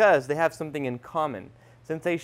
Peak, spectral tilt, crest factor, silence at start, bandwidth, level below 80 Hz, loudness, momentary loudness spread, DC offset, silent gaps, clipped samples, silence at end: -8 dBFS; -6 dB/octave; 16 dB; 0 s; 15.5 kHz; -66 dBFS; -27 LUFS; 11 LU; under 0.1%; none; under 0.1%; 0 s